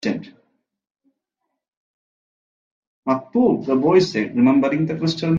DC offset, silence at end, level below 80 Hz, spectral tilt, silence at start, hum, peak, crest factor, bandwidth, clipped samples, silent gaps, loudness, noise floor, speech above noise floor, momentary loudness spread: under 0.1%; 0 s; -62 dBFS; -7 dB/octave; 0.05 s; none; -4 dBFS; 18 dB; 7.6 kHz; under 0.1%; 0.91-0.95 s, 1.68-3.03 s; -19 LUFS; -79 dBFS; 61 dB; 9 LU